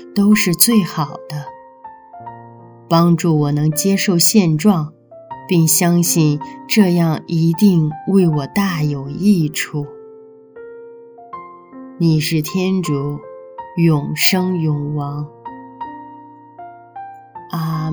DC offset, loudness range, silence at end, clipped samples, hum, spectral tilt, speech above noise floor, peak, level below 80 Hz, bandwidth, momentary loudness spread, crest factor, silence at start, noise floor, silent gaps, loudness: under 0.1%; 7 LU; 0 s; under 0.1%; none; -5 dB/octave; 26 dB; 0 dBFS; -56 dBFS; over 20 kHz; 23 LU; 18 dB; 0 s; -41 dBFS; none; -15 LUFS